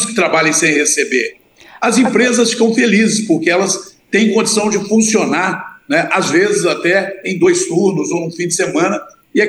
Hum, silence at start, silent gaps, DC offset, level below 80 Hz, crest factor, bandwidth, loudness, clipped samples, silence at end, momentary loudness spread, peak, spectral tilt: none; 0 s; none; under 0.1%; -62 dBFS; 12 dB; 12.5 kHz; -13 LUFS; under 0.1%; 0 s; 7 LU; 0 dBFS; -3.5 dB/octave